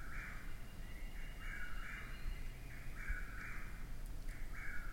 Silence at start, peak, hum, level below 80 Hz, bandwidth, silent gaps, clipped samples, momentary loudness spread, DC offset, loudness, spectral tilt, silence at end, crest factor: 0 s; -30 dBFS; none; -46 dBFS; 16.5 kHz; none; under 0.1%; 6 LU; under 0.1%; -50 LUFS; -4.5 dB/octave; 0 s; 14 dB